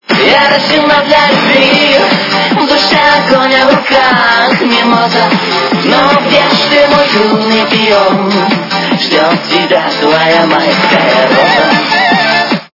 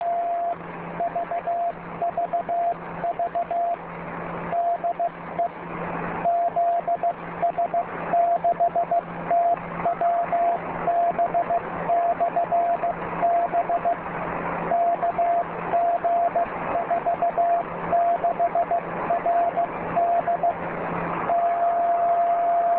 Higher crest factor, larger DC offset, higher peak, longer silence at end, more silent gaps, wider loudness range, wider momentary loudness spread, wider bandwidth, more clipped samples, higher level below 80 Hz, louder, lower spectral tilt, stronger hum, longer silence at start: about the same, 8 dB vs 12 dB; neither; first, 0 dBFS vs -12 dBFS; about the same, 0.1 s vs 0 s; neither; about the same, 2 LU vs 4 LU; second, 4 LU vs 7 LU; first, 6 kHz vs 4 kHz; first, 2% vs under 0.1%; first, -46 dBFS vs -56 dBFS; first, -7 LUFS vs -24 LUFS; second, -4.5 dB/octave vs -10 dB/octave; neither; about the same, 0.1 s vs 0 s